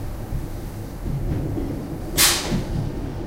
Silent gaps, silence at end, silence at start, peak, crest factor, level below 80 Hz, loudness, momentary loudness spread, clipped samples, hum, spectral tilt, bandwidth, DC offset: none; 0 s; 0 s; -2 dBFS; 22 dB; -32 dBFS; -23 LUFS; 16 LU; under 0.1%; none; -3 dB/octave; 16 kHz; under 0.1%